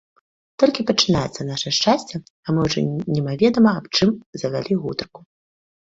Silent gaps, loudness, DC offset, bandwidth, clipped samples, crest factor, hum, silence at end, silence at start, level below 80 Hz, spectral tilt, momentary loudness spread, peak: 2.30-2.43 s, 4.26-4.33 s; -20 LUFS; under 0.1%; 7.8 kHz; under 0.1%; 18 dB; none; 0.75 s; 0.6 s; -50 dBFS; -5 dB/octave; 10 LU; -2 dBFS